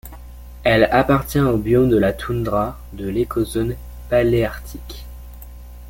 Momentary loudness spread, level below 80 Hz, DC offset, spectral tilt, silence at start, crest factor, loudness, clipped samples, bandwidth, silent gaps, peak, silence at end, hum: 24 LU; -34 dBFS; under 0.1%; -7 dB/octave; 0.05 s; 18 dB; -19 LUFS; under 0.1%; 17 kHz; none; -2 dBFS; 0 s; none